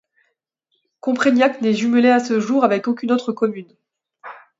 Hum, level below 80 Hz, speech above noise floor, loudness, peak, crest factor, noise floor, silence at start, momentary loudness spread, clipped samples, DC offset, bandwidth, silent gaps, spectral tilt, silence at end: none; -72 dBFS; 55 dB; -18 LUFS; -2 dBFS; 18 dB; -72 dBFS; 1.05 s; 13 LU; under 0.1%; under 0.1%; 7.8 kHz; none; -5.5 dB/octave; 0.25 s